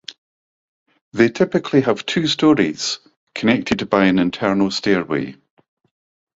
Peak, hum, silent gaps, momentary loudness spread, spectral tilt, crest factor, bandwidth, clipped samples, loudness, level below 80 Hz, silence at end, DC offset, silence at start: -2 dBFS; none; 0.18-0.86 s, 1.01-1.11 s, 3.17-3.27 s; 12 LU; -5 dB/octave; 18 dB; 7.8 kHz; under 0.1%; -18 LUFS; -54 dBFS; 1.05 s; under 0.1%; 0.1 s